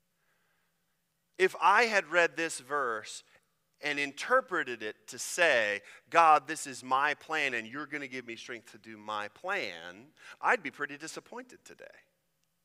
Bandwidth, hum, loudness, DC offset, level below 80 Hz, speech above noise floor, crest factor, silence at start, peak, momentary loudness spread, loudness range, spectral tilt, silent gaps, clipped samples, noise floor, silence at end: 15.5 kHz; none; -30 LUFS; under 0.1%; -84 dBFS; 48 dB; 24 dB; 1.4 s; -8 dBFS; 20 LU; 8 LU; -2 dB/octave; none; under 0.1%; -79 dBFS; 0.8 s